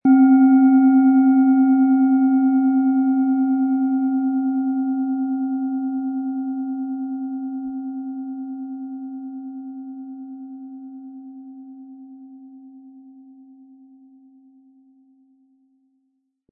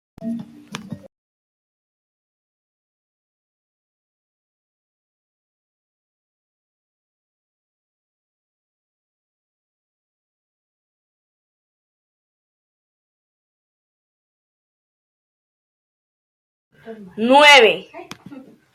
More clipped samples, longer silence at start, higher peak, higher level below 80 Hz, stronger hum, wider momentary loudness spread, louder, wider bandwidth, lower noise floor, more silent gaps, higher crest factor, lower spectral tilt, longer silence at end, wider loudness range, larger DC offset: neither; second, 0.05 s vs 0.2 s; second, -6 dBFS vs 0 dBFS; second, -78 dBFS vs -72 dBFS; neither; second, 24 LU vs 27 LU; second, -19 LUFS vs -11 LUFS; second, 2.4 kHz vs 15.5 kHz; first, -71 dBFS vs -41 dBFS; second, none vs 1.18-16.71 s; second, 14 dB vs 24 dB; first, -13 dB/octave vs -2.5 dB/octave; first, 3.6 s vs 0.75 s; first, 23 LU vs 20 LU; neither